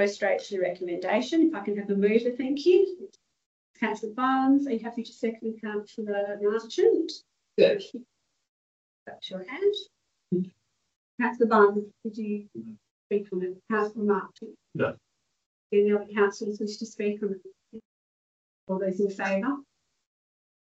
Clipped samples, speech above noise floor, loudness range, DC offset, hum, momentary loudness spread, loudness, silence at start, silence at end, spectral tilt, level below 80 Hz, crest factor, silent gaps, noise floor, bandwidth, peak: under 0.1%; over 63 dB; 6 LU; under 0.1%; none; 16 LU; -27 LUFS; 0 s; 1 s; -6 dB/octave; -78 dBFS; 22 dB; 3.46-3.74 s, 8.49-9.06 s, 10.96-11.18 s, 12.91-13.10 s, 15.46-15.70 s, 17.85-18.67 s; under -90 dBFS; 8 kHz; -6 dBFS